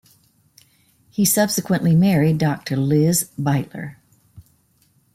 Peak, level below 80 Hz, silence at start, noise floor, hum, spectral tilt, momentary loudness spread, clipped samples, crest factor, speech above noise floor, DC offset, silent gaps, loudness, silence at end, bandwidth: -6 dBFS; -56 dBFS; 1.2 s; -61 dBFS; none; -5.5 dB/octave; 15 LU; under 0.1%; 16 dB; 42 dB; under 0.1%; none; -18 LUFS; 0.75 s; 16.5 kHz